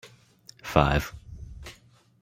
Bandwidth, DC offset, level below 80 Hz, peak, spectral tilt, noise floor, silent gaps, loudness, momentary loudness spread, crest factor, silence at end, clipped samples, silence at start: 16.5 kHz; under 0.1%; -40 dBFS; -2 dBFS; -6 dB/octave; -57 dBFS; none; -25 LUFS; 22 LU; 28 dB; 0.5 s; under 0.1%; 0.05 s